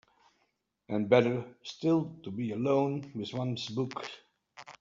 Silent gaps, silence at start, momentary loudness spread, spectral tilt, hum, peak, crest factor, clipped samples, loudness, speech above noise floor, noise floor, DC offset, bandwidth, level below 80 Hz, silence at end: none; 0.9 s; 18 LU; -5.5 dB/octave; none; -10 dBFS; 22 dB; under 0.1%; -31 LUFS; 47 dB; -77 dBFS; under 0.1%; 7.6 kHz; -72 dBFS; 0.1 s